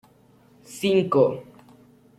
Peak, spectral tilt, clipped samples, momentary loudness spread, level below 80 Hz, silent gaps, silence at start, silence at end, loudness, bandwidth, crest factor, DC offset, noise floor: -6 dBFS; -6 dB/octave; under 0.1%; 19 LU; -66 dBFS; none; 0.7 s; 0.75 s; -22 LUFS; 15 kHz; 20 dB; under 0.1%; -56 dBFS